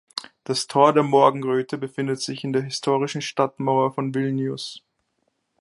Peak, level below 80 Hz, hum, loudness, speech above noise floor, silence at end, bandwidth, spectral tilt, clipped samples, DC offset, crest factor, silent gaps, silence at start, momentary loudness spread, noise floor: -2 dBFS; -72 dBFS; none; -22 LUFS; 51 dB; 0.8 s; 11.5 kHz; -5.5 dB/octave; under 0.1%; under 0.1%; 20 dB; none; 0.15 s; 12 LU; -72 dBFS